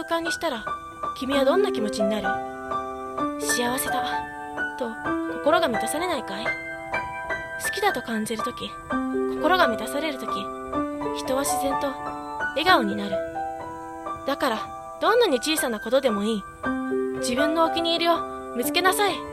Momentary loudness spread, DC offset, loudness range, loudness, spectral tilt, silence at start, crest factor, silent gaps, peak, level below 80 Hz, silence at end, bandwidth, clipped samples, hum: 10 LU; under 0.1%; 3 LU; -25 LUFS; -3 dB/octave; 0 s; 20 dB; none; -4 dBFS; -52 dBFS; 0 s; 16 kHz; under 0.1%; none